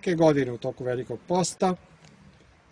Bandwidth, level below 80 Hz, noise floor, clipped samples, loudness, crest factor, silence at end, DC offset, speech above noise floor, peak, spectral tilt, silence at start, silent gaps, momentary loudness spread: 10.5 kHz; -60 dBFS; -55 dBFS; under 0.1%; -26 LUFS; 20 dB; 0.95 s; under 0.1%; 30 dB; -8 dBFS; -5.5 dB/octave; 0 s; none; 10 LU